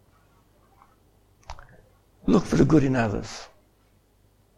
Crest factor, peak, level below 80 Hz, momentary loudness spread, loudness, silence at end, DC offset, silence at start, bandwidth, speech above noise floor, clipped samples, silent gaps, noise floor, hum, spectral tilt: 20 dB; -6 dBFS; -44 dBFS; 26 LU; -22 LUFS; 1.1 s; under 0.1%; 1.5 s; 12.5 kHz; 40 dB; under 0.1%; none; -62 dBFS; none; -7 dB/octave